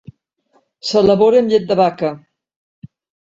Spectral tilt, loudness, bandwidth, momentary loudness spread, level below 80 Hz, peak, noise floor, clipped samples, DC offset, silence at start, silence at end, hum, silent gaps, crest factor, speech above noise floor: -6 dB/octave; -15 LUFS; 7.8 kHz; 13 LU; -52 dBFS; 0 dBFS; -60 dBFS; under 0.1%; under 0.1%; 0.85 s; 0.45 s; none; 2.56-2.82 s; 16 dB; 47 dB